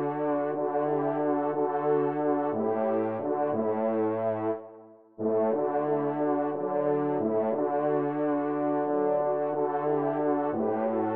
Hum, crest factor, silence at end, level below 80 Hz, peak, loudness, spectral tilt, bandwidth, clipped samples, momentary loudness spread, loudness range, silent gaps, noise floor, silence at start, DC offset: none; 12 dB; 0 s; -80 dBFS; -16 dBFS; -28 LUFS; -8 dB/octave; 3.7 kHz; under 0.1%; 3 LU; 1 LU; none; -51 dBFS; 0 s; 0.1%